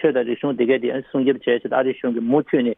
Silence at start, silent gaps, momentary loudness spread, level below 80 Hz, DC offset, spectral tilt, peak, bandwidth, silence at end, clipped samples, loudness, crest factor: 0 s; none; 4 LU; -68 dBFS; under 0.1%; -9.5 dB/octave; -6 dBFS; 3.8 kHz; 0.05 s; under 0.1%; -20 LUFS; 14 dB